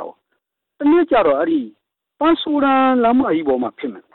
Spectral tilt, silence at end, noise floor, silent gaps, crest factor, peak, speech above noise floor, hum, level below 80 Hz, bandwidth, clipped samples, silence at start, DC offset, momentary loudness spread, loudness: -9.5 dB/octave; 0.15 s; -73 dBFS; none; 10 dB; -8 dBFS; 56 dB; none; -52 dBFS; 4.2 kHz; under 0.1%; 0 s; under 0.1%; 11 LU; -16 LUFS